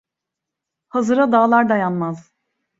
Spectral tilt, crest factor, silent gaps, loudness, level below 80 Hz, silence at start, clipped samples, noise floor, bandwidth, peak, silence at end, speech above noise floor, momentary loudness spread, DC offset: -7 dB/octave; 18 dB; none; -17 LUFS; -66 dBFS; 0.95 s; under 0.1%; -83 dBFS; 7.8 kHz; -2 dBFS; 0.6 s; 67 dB; 12 LU; under 0.1%